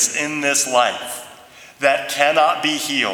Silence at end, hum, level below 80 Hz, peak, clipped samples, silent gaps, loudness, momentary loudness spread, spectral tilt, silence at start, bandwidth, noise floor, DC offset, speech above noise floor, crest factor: 0 s; none; -68 dBFS; 0 dBFS; under 0.1%; none; -17 LUFS; 10 LU; -1 dB/octave; 0 s; 19.5 kHz; -43 dBFS; under 0.1%; 25 dB; 18 dB